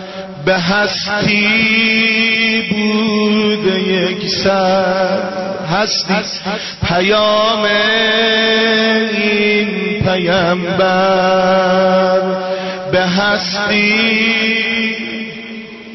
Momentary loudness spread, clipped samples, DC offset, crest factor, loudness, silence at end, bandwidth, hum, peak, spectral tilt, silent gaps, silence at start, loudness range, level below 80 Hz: 9 LU; under 0.1%; under 0.1%; 10 dB; -13 LUFS; 0 s; 6.2 kHz; none; -4 dBFS; -4.5 dB/octave; none; 0 s; 2 LU; -44 dBFS